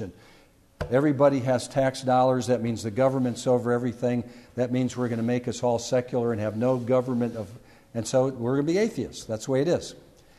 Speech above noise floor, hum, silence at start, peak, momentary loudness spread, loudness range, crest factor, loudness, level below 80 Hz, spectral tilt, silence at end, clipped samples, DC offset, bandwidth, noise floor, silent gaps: 31 dB; none; 0 s; -8 dBFS; 11 LU; 3 LU; 18 dB; -25 LUFS; -56 dBFS; -6.5 dB/octave; 0.45 s; under 0.1%; under 0.1%; 13 kHz; -56 dBFS; none